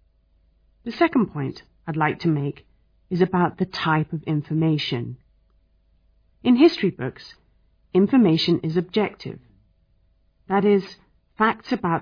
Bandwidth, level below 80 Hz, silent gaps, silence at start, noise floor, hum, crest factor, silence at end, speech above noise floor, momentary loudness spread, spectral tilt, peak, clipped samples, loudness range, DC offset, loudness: 5.2 kHz; -58 dBFS; none; 0.85 s; -62 dBFS; none; 18 dB; 0 s; 41 dB; 19 LU; -8 dB/octave; -6 dBFS; under 0.1%; 4 LU; under 0.1%; -22 LUFS